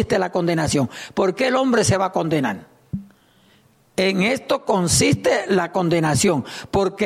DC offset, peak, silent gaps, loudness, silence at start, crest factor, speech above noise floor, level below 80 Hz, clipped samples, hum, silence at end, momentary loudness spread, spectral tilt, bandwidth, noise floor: under 0.1%; -6 dBFS; none; -19 LUFS; 0 s; 14 dB; 36 dB; -46 dBFS; under 0.1%; none; 0 s; 9 LU; -4.5 dB/octave; 16 kHz; -56 dBFS